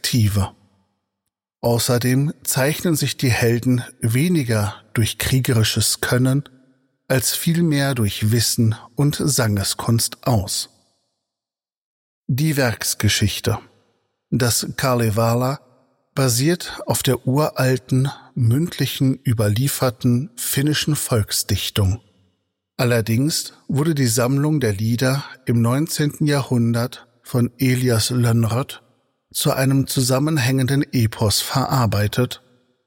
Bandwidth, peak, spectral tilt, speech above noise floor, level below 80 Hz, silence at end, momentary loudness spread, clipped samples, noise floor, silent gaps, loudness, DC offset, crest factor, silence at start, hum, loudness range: 17 kHz; -2 dBFS; -5 dB/octave; over 71 dB; -48 dBFS; 0.5 s; 6 LU; under 0.1%; under -90 dBFS; 11.78-12.24 s; -19 LUFS; under 0.1%; 18 dB; 0.05 s; none; 3 LU